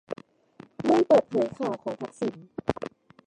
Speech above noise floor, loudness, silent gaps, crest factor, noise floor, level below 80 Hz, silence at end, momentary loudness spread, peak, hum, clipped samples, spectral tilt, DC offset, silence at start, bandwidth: 27 dB; -26 LUFS; none; 22 dB; -53 dBFS; -60 dBFS; 0.4 s; 18 LU; -6 dBFS; none; under 0.1%; -7 dB/octave; under 0.1%; 0.1 s; 10 kHz